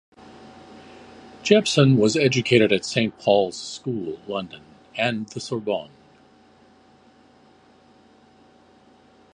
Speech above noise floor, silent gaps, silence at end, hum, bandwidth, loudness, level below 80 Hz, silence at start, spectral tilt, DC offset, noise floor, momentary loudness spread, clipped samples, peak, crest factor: 33 dB; none; 3.5 s; none; 11 kHz; -21 LUFS; -62 dBFS; 0.4 s; -5 dB/octave; under 0.1%; -54 dBFS; 14 LU; under 0.1%; -2 dBFS; 22 dB